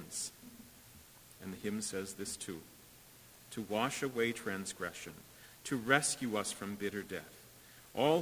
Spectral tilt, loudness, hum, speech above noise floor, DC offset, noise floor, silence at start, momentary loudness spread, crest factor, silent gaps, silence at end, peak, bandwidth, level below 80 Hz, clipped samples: -3.5 dB/octave; -37 LUFS; none; 22 dB; under 0.1%; -59 dBFS; 0 s; 24 LU; 26 dB; none; 0 s; -12 dBFS; 16 kHz; -70 dBFS; under 0.1%